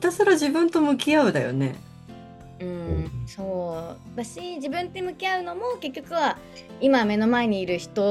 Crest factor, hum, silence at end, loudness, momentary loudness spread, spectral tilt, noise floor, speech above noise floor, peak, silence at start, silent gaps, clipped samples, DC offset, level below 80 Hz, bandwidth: 16 dB; none; 0 s; -24 LUFS; 16 LU; -5.5 dB/octave; -43 dBFS; 19 dB; -8 dBFS; 0 s; none; under 0.1%; under 0.1%; -50 dBFS; 13.5 kHz